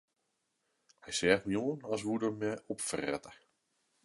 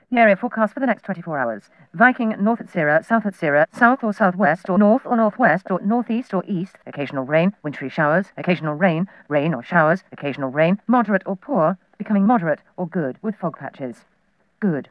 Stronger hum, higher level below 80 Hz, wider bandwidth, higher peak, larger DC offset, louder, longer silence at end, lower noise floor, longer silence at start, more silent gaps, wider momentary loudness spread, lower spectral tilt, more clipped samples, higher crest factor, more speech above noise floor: neither; about the same, -68 dBFS vs -72 dBFS; first, 11.5 kHz vs 10 kHz; second, -10 dBFS vs -2 dBFS; neither; second, -34 LUFS vs -20 LUFS; first, 0.7 s vs 0.1 s; first, -82 dBFS vs -65 dBFS; first, 1.05 s vs 0.1 s; neither; about the same, 9 LU vs 11 LU; second, -4 dB/octave vs -8.5 dB/octave; neither; first, 26 dB vs 18 dB; about the same, 48 dB vs 45 dB